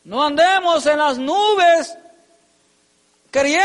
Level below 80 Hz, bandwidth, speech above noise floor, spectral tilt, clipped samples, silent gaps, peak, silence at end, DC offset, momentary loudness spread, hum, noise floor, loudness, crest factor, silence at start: -60 dBFS; 11.5 kHz; 44 dB; -2 dB/octave; under 0.1%; none; -6 dBFS; 0 s; under 0.1%; 6 LU; none; -60 dBFS; -16 LUFS; 12 dB; 0.05 s